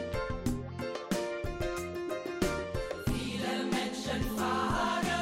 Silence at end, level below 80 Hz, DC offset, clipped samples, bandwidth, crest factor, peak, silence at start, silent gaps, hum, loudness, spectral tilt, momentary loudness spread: 0 s; -44 dBFS; under 0.1%; under 0.1%; 16.5 kHz; 16 dB; -18 dBFS; 0 s; none; none; -34 LUFS; -5 dB/octave; 7 LU